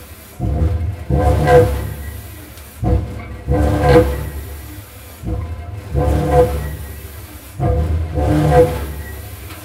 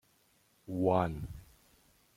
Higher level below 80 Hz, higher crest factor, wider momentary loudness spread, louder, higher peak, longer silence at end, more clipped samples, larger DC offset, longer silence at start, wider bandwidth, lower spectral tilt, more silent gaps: first, -24 dBFS vs -56 dBFS; second, 16 dB vs 22 dB; about the same, 21 LU vs 23 LU; first, -17 LUFS vs -33 LUFS; first, 0 dBFS vs -14 dBFS; second, 0 s vs 0.75 s; neither; neither; second, 0 s vs 0.7 s; about the same, 16 kHz vs 16 kHz; about the same, -7.5 dB/octave vs -8.5 dB/octave; neither